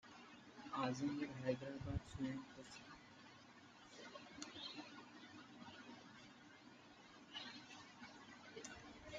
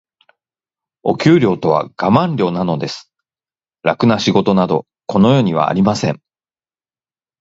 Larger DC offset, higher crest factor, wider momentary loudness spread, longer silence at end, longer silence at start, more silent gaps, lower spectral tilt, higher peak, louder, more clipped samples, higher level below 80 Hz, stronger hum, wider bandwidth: neither; first, 24 dB vs 16 dB; first, 17 LU vs 10 LU; second, 0 s vs 1.25 s; second, 0.05 s vs 1.05 s; neither; second, -5 dB/octave vs -7 dB/octave; second, -28 dBFS vs 0 dBFS; second, -51 LUFS vs -15 LUFS; neither; second, -68 dBFS vs -50 dBFS; neither; first, 9 kHz vs 8 kHz